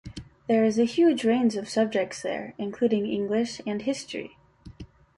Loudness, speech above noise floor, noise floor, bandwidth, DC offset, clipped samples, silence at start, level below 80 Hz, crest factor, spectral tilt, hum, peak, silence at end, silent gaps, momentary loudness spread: -26 LUFS; 21 dB; -46 dBFS; 11.5 kHz; under 0.1%; under 0.1%; 0.05 s; -58 dBFS; 16 dB; -5.5 dB/octave; none; -12 dBFS; 0.35 s; none; 17 LU